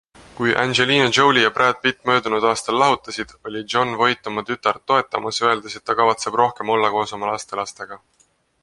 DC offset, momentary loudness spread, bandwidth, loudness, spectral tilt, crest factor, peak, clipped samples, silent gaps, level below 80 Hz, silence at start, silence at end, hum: under 0.1%; 13 LU; 11.5 kHz; -19 LUFS; -3.5 dB/octave; 20 dB; 0 dBFS; under 0.1%; none; -58 dBFS; 0.4 s; 0.65 s; none